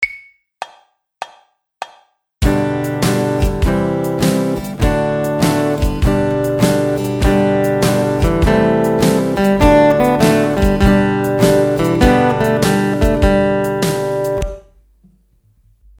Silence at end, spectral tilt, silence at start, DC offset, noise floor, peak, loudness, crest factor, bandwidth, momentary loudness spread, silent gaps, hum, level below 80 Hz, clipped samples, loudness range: 1.4 s; -6 dB/octave; 0 s; under 0.1%; -54 dBFS; 0 dBFS; -14 LUFS; 14 dB; 19 kHz; 12 LU; none; none; -24 dBFS; under 0.1%; 6 LU